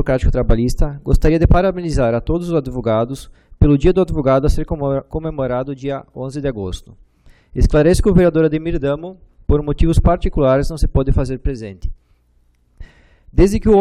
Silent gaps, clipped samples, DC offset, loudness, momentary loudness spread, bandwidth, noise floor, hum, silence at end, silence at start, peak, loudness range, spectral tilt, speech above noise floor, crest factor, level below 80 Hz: none; under 0.1%; under 0.1%; -17 LUFS; 13 LU; 13 kHz; -56 dBFS; none; 0 s; 0 s; -2 dBFS; 5 LU; -7.5 dB/octave; 41 dB; 14 dB; -22 dBFS